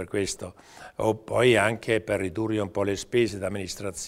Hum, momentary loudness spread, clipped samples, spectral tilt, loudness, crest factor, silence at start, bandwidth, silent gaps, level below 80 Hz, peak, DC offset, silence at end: none; 13 LU; under 0.1%; -4.5 dB/octave; -26 LUFS; 20 dB; 0 s; 15.5 kHz; none; -54 dBFS; -6 dBFS; under 0.1%; 0 s